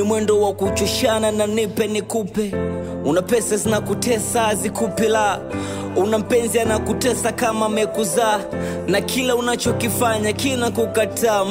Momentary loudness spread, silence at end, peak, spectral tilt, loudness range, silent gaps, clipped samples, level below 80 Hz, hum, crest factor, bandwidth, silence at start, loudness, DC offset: 5 LU; 0 s; -6 dBFS; -4 dB/octave; 1 LU; none; under 0.1%; -44 dBFS; none; 12 dB; 16.5 kHz; 0 s; -19 LUFS; under 0.1%